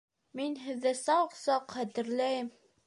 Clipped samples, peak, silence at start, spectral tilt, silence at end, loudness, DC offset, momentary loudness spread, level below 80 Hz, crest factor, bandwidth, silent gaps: under 0.1%; -16 dBFS; 0.35 s; -3.5 dB/octave; 0.35 s; -32 LUFS; under 0.1%; 9 LU; -82 dBFS; 16 dB; 11.5 kHz; none